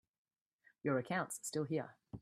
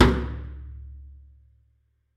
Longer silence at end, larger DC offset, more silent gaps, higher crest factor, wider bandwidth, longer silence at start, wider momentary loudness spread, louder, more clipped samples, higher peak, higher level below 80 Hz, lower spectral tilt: second, 0 s vs 1.1 s; neither; neither; second, 18 dB vs 26 dB; first, 15 kHz vs 11 kHz; first, 0.85 s vs 0 s; second, 6 LU vs 22 LU; second, -40 LUFS vs -28 LUFS; neither; second, -24 dBFS vs 0 dBFS; second, -78 dBFS vs -34 dBFS; second, -5 dB/octave vs -7 dB/octave